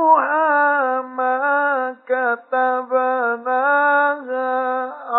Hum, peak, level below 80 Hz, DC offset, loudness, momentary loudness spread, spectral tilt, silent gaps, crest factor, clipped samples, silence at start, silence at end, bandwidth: none; -2 dBFS; under -90 dBFS; under 0.1%; -18 LUFS; 7 LU; -7.5 dB/octave; none; 16 dB; under 0.1%; 0 s; 0 s; 4.1 kHz